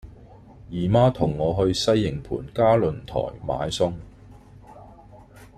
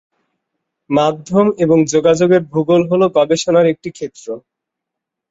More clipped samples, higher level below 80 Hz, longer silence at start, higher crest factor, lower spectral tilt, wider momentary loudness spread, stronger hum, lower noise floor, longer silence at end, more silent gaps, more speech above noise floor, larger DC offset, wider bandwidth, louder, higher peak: neither; first, -44 dBFS vs -56 dBFS; second, 0.05 s vs 0.9 s; first, 20 dB vs 14 dB; about the same, -6.5 dB/octave vs -6 dB/octave; second, 11 LU vs 15 LU; neither; second, -47 dBFS vs -81 dBFS; second, 0.1 s vs 0.9 s; neither; second, 25 dB vs 67 dB; neither; first, 14 kHz vs 8 kHz; second, -23 LUFS vs -14 LUFS; about the same, -4 dBFS vs -2 dBFS